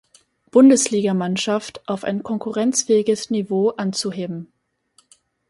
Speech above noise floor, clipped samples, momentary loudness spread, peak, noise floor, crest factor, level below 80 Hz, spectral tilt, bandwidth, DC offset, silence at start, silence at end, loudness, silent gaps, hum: 42 dB; under 0.1%; 13 LU; -2 dBFS; -61 dBFS; 18 dB; -66 dBFS; -4.5 dB/octave; 11.5 kHz; under 0.1%; 0.55 s; 1.05 s; -19 LUFS; none; none